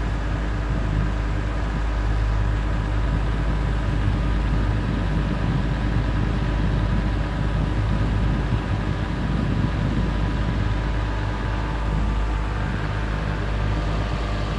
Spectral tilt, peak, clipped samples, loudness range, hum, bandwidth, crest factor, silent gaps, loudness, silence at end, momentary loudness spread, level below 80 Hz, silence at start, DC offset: -7.5 dB/octave; -10 dBFS; under 0.1%; 2 LU; none; 8.4 kHz; 12 dB; none; -24 LUFS; 0 s; 3 LU; -24 dBFS; 0 s; under 0.1%